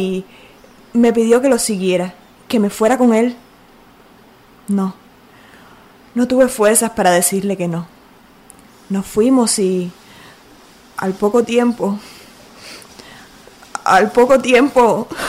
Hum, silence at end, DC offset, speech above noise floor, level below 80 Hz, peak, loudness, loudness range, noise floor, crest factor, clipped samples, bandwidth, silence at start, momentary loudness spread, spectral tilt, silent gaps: none; 0 s; under 0.1%; 31 dB; -50 dBFS; 0 dBFS; -15 LUFS; 5 LU; -46 dBFS; 16 dB; under 0.1%; 16 kHz; 0 s; 16 LU; -4.5 dB/octave; none